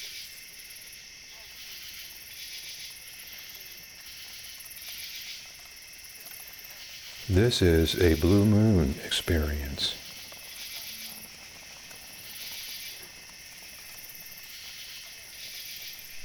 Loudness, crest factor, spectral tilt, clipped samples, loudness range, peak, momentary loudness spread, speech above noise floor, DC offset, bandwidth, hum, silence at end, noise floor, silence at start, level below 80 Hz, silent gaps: -30 LUFS; 22 dB; -5 dB/octave; under 0.1%; 15 LU; -8 dBFS; 20 LU; 23 dB; under 0.1%; over 20 kHz; none; 0 s; -47 dBFS; 0 s; -44 dBFS; none